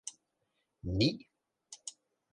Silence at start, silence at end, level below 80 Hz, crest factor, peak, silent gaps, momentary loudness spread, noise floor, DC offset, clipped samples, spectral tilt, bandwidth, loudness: 0.05 s; 0.45 s; -54 dBFS; 24 dB; -16 dBFS; none; 17 LU; -81 dBFS; under 0.1%; under 0.1%; -5 dB/octave; 11 kHz; -35 LUFS